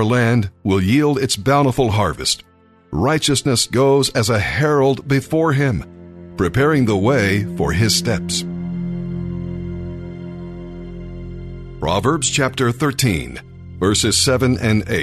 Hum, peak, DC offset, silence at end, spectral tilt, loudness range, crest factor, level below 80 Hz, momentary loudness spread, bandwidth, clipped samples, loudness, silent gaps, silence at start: none; -2 dBFS; under 0.1%; 0 s; -4.5 dB/octave; 8 LU; 16 dB; -38 dBFS; 17 LU; 13.5 kHz; under 0.1%; -17 LUFS; none; 0 s